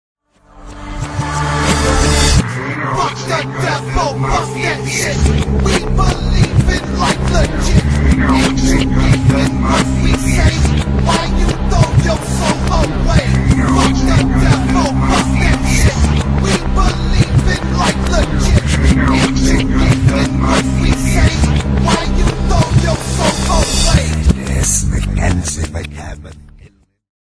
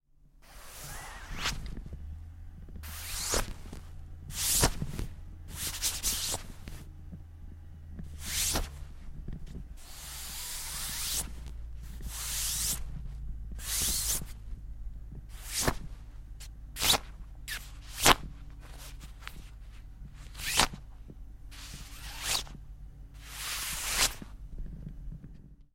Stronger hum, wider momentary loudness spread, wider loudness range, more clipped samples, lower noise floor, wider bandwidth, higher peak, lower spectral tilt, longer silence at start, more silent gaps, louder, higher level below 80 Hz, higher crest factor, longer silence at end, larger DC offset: neither; second, 5 LU vs 22 LU; second, 3 LU vs 7 LU; neither; second, -44 dBFS vs -58 dBFS; second, 11 kHz vs 16.5 kHz; about the same, 0 dBFS vs -2 dBFS; first, -5 dB/octave vs -1.5 dB/octave; first, 0.55 s vs 0.25 s; neither; first, -14 LUFS vs -31 LUFS; first, -18 dBFS vs -42 dBFS; second, 12 dB vs 34 dB; first, 0.6 s vs 0.1 s; neither